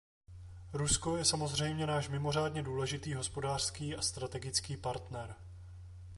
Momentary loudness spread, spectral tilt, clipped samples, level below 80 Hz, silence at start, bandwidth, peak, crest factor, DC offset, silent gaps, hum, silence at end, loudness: 21 LU; -3.5 dB/octave; under 0.1%; -54 dBFS; 0.3 s; 11.5 kHz; -16 dBFS; 20 dB; under 0.1%; none; none; 0 s; -35 LUFS